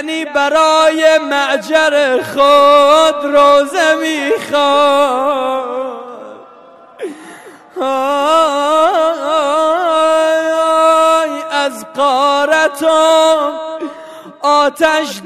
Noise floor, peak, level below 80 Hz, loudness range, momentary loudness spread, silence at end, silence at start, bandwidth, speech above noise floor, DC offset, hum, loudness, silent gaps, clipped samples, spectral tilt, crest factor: -39 dBFS; 0 dBFS; -56 dBFS; 6 LU; 13 LU; 0 s; 0 s; 14 kHz; 28 dB; 0.3%; none; -11 LUFS; none; under 0.1%; -2 dB/octave; 12 dB